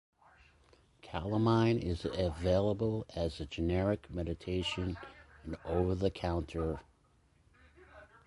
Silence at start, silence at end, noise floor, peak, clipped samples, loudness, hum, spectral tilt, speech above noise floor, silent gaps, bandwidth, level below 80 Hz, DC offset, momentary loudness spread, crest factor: 1.05 s; 0.2 s; -69 dBFS; -16 dBFS; under 0.1%; -34 LUFS; none; -7.5 dB/octave; 35 dB; none; 11.5 kHz; -48 dBFS; under 0.1%; 14 LU; 18 dB